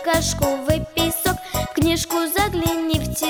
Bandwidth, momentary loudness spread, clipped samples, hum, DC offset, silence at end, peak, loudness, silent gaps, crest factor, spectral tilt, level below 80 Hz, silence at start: over 20 kHz; 3 LU; under 0.1%; none; under 0.1%; 0 s; -6 dBFS; -21 LUFS; none; 16 dB; -4 dB/octave; -34 dBFS; 0 s